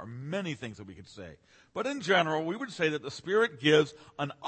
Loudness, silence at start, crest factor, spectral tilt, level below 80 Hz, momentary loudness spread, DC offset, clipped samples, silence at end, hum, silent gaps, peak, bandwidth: -29 LUFS; 0 s; 20 dB; -5 dB/octave; -70 dBFS; 22 LU; under 0.1%; under 0.1%; 0 s; none; none; -10 dBFS; 8.8 kHz